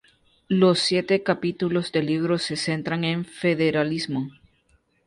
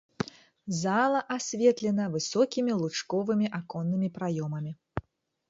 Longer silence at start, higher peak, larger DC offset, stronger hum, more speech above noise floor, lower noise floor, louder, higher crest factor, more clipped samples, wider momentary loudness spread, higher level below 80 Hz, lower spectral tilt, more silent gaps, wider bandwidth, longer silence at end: first, 0.5 s vs 0.2 s; first, -6 dBFS vs -10 dBFS; neither; neither; first, 41 dB vs 29 dB; first, -64 dBFS vs -57 dBFS; first, -23 LUFS vs -29 LUFS; about the same, 18 dB vs 18 dB; neither; second, 7 LU vs 12 LU; about the same, -62 dBFS vs -62 dBFS; about the same, -5.5 dB/octave vs -5.5 dB/octave; neither; first, 11.5 kHz vs 7.8 kHz; first, 0.75 s vs 0.5 s